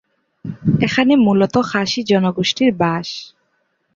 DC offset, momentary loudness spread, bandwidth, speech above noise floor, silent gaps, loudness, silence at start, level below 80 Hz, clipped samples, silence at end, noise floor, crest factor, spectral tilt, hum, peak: under 0.1%; 15 LU; 7.6 kHz; 50 dB; none; -16 LUFS; 0.45 s; -50 dBFS; under 0.1%; 0.7 s; -66 dBFS; 16 dB; -6 dB/octave; none; -2 dBFS